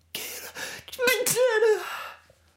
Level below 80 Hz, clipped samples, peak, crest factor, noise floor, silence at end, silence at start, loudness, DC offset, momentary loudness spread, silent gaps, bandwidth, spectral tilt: -68 dBFS; under 0.1%; -8 dBFS; 18 dB; -48 dBFS; 0.4 s; 0.15 s; -25 LUFS; under 0.1%; 15 LU; none; 16.5 kHz; -1 dB/octave